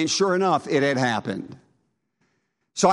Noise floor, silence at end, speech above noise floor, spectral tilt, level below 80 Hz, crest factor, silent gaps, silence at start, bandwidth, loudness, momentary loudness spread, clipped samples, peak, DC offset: -72 dBFS; 0 s; 50 dB; -4 dB/octave; -68 dBFS; 20 dB; none; 0 s; 11.5 kHz; -22 LUFS; 14 LU; under 0.1%; -4 dBFS; under 0.1%